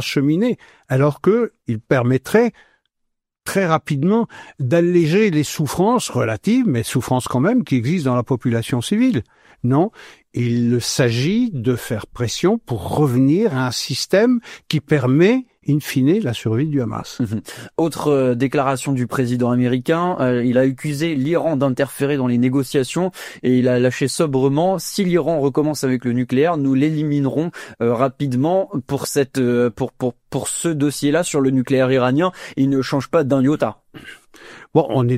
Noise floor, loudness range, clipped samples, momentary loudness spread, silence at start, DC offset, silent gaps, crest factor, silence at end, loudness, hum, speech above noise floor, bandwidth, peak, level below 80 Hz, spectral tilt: -74 dBFS; 2 LU; under 0.1%; 7 LU; 0 s; under 0.1%; none; 16 dB; 0 s; -18 LUFS; none; 56 dB; 15.5 kHz; 0 dBFS; -52 dBFS; -6 dB/octave